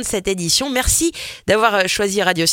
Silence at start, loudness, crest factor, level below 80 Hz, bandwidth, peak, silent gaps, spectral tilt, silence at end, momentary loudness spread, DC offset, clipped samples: 0 s; -17 LUFS; 16 dB; -34 dBFS; 17 kHz; -2 dBFS; none; -2.5 dB/octave; 0 s; 6 LU; under 0.1%; under 0.1%